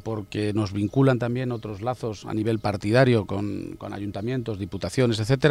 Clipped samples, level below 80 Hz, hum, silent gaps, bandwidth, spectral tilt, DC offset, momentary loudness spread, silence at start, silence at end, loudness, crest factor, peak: under 0.1%; -52 dBFS; none; none; 12.5 kHz; -7 dB/octave; under 0.1%; 11 LU; 0.05 s; 0 s; -25 LUFS; 18 dB; -6 dBFS